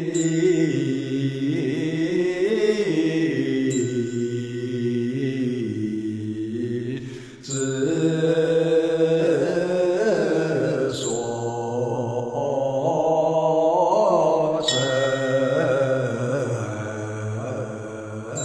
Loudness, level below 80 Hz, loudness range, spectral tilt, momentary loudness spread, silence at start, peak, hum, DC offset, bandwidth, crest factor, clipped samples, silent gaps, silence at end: -23 LUFS; -60 dBFS; 5 LU; -5.5 dB/octave; 9 LU; 0 s; -8 dBFS; none; under 0.1%; 11 kHz; 16 dB; under 0.1%; none; 0 s